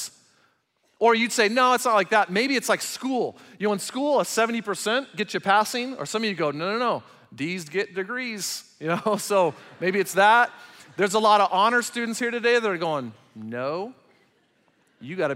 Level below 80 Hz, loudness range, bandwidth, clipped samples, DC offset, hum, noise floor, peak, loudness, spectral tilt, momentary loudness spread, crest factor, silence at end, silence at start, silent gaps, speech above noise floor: -78 dBFS; 6 LU; 16 kHz; under 0.1%; under 0.1%; none; -68 dBFS; -6 dBFS; -23 LUFS; -3.5 dB/octave; 12 LU; 18 dB; 0 s; 0 s; none; 45 dB